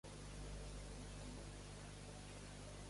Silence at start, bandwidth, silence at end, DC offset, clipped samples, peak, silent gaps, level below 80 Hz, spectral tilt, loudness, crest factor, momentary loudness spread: 0.05 s; 11.5 kHz; 0 s; under 0.1%; under 0.1%; -40 dBFS; none; -56 dBFS; -4.5 dB/octave; -54 LUFS; 12 dB; 2 LU